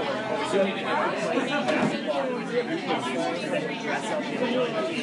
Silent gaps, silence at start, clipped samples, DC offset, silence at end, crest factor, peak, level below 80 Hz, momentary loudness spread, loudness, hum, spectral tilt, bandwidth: none; 0 s; under 0.1%; under 0.1%; 0 s; 16 dB; -10 dBFS; -74 dBFS; 4 LU; -27 LUFS; none; -4.5 dB/octave; 11.5 kHz